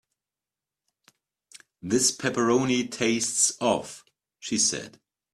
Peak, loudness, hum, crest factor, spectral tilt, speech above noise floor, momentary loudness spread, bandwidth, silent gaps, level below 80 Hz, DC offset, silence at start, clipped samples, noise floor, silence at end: -8 dBFS; -24 LUFS; none; 20 dB; -2.5 dB/octave; over 65 dB; 18 LU; 14 kHz; none; -66 dBFS; under 0.1%; 1.85 s; under 0.1%; under -90 dBFS; 0.45 s